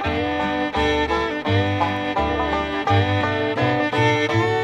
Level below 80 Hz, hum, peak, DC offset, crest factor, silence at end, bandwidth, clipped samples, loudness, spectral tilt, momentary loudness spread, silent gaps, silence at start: -38 dBFS; none; -6 dBFS; under 0.1%; 14 dB; 0 s; 9.4 kHz; under 0.1%; -20 LUFS; -6 dB/octave; 4 LU; none; 0 s